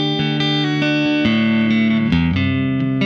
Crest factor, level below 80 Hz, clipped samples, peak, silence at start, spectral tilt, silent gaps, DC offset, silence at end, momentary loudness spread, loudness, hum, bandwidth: 10 dB; -40 dBFS; under 0.1%; -6 dBFS; 0 s; -7 dB/octave; none; under 0.1%; 0 s; 3 LU; -17 LUFS; none; 7.2 kHz